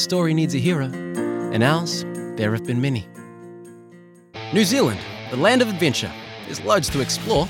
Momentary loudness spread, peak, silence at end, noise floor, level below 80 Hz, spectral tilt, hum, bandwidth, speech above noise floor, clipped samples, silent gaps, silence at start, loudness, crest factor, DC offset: 19 LU; -2 dBFS; 0 s; -47 dBFS; -48 dBFS; -5 dB/octave; none; 17 kHz; 27 dB; under 0.1%; none; 0 s; -21 LUFS; 20 dB; under 0.1%